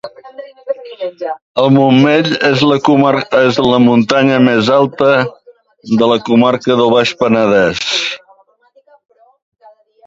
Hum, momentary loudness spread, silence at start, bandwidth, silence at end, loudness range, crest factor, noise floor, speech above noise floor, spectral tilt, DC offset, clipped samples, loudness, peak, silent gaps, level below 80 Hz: none; 14 LU; 0.05 s; 7.8 kHz; 1.9 s; 3 LU; 12 dB; -51 dBFS; 40 dB; -6 dB/octave; under 0.1%; under 0.1%; -11 LUFS; 0 dBFS; 1.42-1.55 s; -52 dBFS